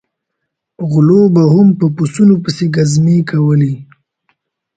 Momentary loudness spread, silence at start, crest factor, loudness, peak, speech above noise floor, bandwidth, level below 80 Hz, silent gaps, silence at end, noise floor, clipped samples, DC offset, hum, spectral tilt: 8 LU; 0.8 s; 12 dB; -11 LUFS; 0 dBFS; 64 dB; 9.2 kHz; -50 dBFS; none; 0.95 s; -74 dBFS; under 0.1%; under 0.1%; none; -7.5 dB/octave